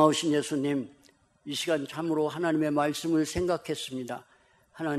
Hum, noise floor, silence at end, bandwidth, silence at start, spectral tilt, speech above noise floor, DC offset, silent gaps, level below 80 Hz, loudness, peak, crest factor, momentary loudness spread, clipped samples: none; -62 dBFS; 0 s; 14.5 kHz; 0 s; -4.5 dB/octave; 34 dB; under 0.1%; none; -58 dBFS; -29 LUFS; -8 dBFS; 20 dB; 10 LU; under 0.1%